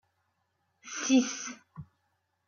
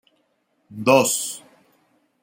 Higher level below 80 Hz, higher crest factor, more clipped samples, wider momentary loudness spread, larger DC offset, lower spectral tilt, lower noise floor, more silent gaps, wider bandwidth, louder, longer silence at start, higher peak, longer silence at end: second, -74 dBFS vs -68 dBFS; about the same, 20 dB vs 22 dB; neither; first, 24 LU vs 21 LU; neither; about the same, -2.5 dB/octave vs -3 dB/octave; first, -78 dBFS vs -68 dBFS; neither; second, 7.2 kHz vs 16.5 kHz; second, -29 LUFS vs -19 LUFS; first, 0.85 s vs 0.7 s; second, -14 dBFS vs -2 dBFS; second, 0.65 s vs 0.85 s